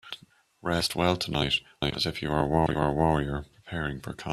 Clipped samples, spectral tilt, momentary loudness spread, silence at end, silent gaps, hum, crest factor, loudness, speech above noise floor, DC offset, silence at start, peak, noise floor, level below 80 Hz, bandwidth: under 0.1%; -5 dB/octave; 12 LU; 0 s; none; none; 20 dB; -28 LUFS; 26 dB; under 0.1%; 0.05 s; -10 dBFS; -53 dBFS; -46 dBFS; 14 kHz